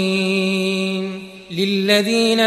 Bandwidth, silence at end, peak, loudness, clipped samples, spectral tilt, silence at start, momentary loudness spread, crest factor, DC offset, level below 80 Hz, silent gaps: 14.5 kHz; 0 s; -2 dBFS; -18 LUFS; under 0.1%; -4.5 dB/octave; 0 s; 13 LU; 16 dB; under 0.1%; -62 dBFS; none